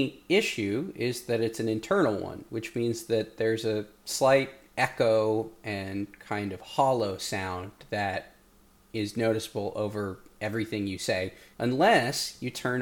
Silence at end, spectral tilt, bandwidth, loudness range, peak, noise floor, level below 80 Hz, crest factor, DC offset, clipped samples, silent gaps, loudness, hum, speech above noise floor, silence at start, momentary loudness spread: 0 s; -4.5 dB/octave; 19 kHz; 5 LU; -8 dBFS; -60 dBFS; -62 dBFS; 20 dB; under 0.1%; under 0.1%; none; -29 LUFS; none; 31 dB; 0 s; 11 LU